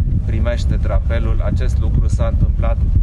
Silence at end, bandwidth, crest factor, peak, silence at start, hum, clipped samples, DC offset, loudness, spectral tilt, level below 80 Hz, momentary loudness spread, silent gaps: 0 s; 8.4 kHz; 12 dB; -4 dBFS; 0 s; none; under 0.1%; under 0.1%; -18 LUFS; -8 dB/octave; -16 dBFS; 2 LU; none